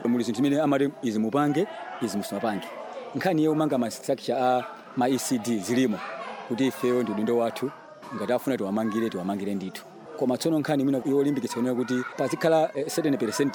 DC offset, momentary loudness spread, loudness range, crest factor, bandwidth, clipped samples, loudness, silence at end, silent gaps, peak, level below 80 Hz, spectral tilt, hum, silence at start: under 0.1%; 10 LU; 2 LU; 16 dB; over 20 kHz; under 0.1%; -26 LUFS; 0 s; none; -10 dBFS; -72 dBFS; -5.5 dB/octave; none; 0 s